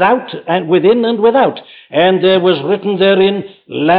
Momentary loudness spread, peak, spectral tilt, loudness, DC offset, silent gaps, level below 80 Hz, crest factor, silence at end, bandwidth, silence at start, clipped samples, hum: 8 LU; -2 dBFS; -9.5 dB/octave; -12 LUFS; under 0.1%; none; -58 dBFS; 10 dB; 0 s; 4.9 kHz; 0 s; under 0.1%; none